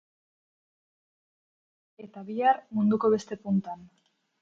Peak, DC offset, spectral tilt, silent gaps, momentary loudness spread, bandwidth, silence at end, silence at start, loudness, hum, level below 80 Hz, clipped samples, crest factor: -10 dBFS; under 0.1%; -7.5 dB/octave; none; 19 LU; 7.6 kHz; 0.55 s; 2 s; -27 LUFS; none; -72 dBFS; under 0.1%; 20 dB